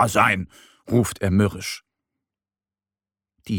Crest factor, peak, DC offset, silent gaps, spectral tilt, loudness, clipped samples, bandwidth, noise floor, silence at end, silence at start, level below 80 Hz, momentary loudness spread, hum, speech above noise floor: 20 dB; -4 dBFS; under 0.1%; none; -5.5 dB/octave; -22 LUFS; under 0.1%; 17.5 kHz; under -90 dBFS; 0 s; 0 s; -50 dBFS; 15 LU; none; over 69 dB